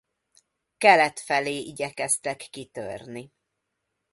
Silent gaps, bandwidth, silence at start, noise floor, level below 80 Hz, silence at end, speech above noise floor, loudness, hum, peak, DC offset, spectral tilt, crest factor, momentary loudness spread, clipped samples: none; 12 kHz; 0.8 s; -80 dBFS; -68 dBFS; 0.85 s; 55 dB; -23 LUFS; none; -4 dBFS; under 0.1%; -2 dB/octave; 24 dB; 20 LU; under 0.1%